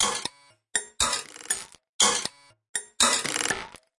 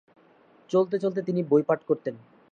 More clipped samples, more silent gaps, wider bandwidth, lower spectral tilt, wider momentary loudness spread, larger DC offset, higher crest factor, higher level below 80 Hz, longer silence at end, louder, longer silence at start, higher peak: neither; first, 1.89-1.99 s, 2.69-2.74 s vs none; first, 12 kHz vs 7.4 kHz; second, 0.5 dB/octave vs -8.5 dB/octave; first, 13 LU vs 6 LU; neither; about the same, 22 dB vs 18 dB; first, -56 dBFS vs -76 dBFS; about the same, 0.3 s vs 0.35 s; about the same, -25 LUFS vs -26 LUFS; second, 0 s vs 0.7 s; first, -6 dBFS vs -10 dBFS